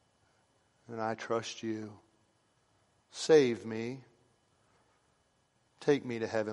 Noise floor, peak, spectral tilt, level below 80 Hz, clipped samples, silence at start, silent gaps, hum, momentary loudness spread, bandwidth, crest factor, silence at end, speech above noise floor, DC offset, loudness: -73 dBFS; -12 dBFS; -5 dB/octave; -80 dBFS; under 0.1%; 0.9 s; none; none; 21 LU; 11 kHz; 24 dB; 0 s; 42 dB; under 0.1%; -32 LUFS